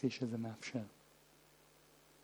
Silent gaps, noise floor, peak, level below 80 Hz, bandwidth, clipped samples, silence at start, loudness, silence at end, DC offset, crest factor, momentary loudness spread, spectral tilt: none; -67 dBFS; -22 dBFS; -82 dBFS; over 20 kHz; under 0.1%; 0 s; -43 LUFS; 1.3 s; under 0.1%; 22 dB; 24 LU; -6 dB/octave